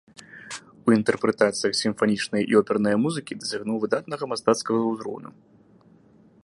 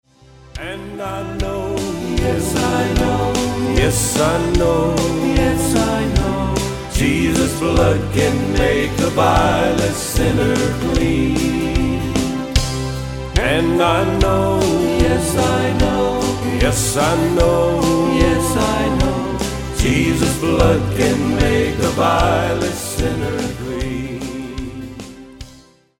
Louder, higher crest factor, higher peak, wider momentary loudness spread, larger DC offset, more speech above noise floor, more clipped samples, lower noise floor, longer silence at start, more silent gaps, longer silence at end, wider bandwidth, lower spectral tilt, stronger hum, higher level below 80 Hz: second, -24 LUFS vs -17 LUFS; first, 22 dB vs 16 dB; second, -4 dBFS vs 0 dBFS; first, 15 LU vs 9 LU; neither; about the same, 32 dB vs 30 dB; neither; first, -55 dBFS vs -46 dBFS; second, 0.35 s vs 0.55 s; neither; first, 1.15 s vs 0.45 s; second, 11.5 kHz vs 18 kHz; about the same, -4.5 dB/octave vs -5 dB/octave; neither; second, -66 dBFS vs -26 dBFS